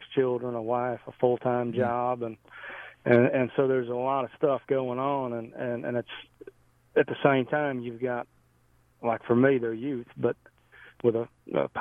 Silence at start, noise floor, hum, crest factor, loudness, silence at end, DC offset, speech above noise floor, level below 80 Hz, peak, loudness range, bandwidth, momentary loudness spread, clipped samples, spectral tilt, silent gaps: 0 s; -64 dBFS; none; 20 dB; -28 LUFS; 0 s; under 0.1%; 37 dB; -68 dBFS; -8 dBFS; 3 LU; 4 kHz; 11 LU; under 0.1%; -9.5 dB/octave; none